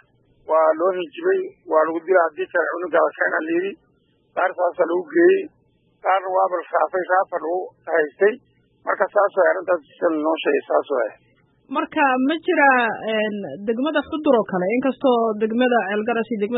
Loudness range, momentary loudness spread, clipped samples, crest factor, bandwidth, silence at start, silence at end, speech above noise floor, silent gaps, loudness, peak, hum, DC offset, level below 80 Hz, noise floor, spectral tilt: 2 LU; 8 LU; under 0.1%; 18 dB; 4.1 kHz; 0.5 s; 0 s; 42 dB; none; -20 LUFS; -2 dBFS; none; under 0.1%; -68 dBFS; -62 dBFS; -10 dB/octave